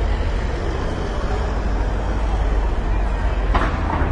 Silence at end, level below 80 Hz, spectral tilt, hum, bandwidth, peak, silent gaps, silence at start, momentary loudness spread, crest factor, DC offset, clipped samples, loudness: 0 s; -20 dBFS; -7 dB/octave; none; 8 kHz; -4 dBFS; none; 0 s; 4 LU; 16 dB; under 0.1%; under 0.1%; -23 LUFS